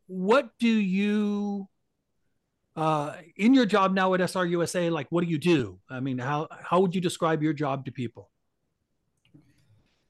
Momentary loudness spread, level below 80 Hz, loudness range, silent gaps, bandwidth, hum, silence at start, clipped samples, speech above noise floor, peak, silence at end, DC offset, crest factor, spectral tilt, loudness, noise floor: 13 LU; -70 dBFS; 5 LU; none; 12.5 kHz; none; 0.1 s; under 0.1%; 53 dB; -10 dBFS; 1.9 s; under 0.1%; 18 dB; -6 dB/octave; -26 LUFS; -78 dBFS